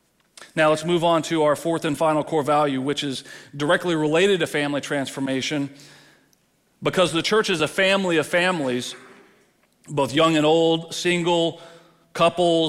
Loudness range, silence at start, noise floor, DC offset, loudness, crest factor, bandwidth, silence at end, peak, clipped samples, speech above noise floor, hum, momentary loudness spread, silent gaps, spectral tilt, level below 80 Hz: 2 LU; 0.4 s; -63 dBFS; under 0.1%; -21 LUFS; 14 dB; 15.5 kHz; 0 s; -8 dBFS; under 0.1%; 42 dB; none; 10 LU; none; -4.5 dB/octave; -62 dBFS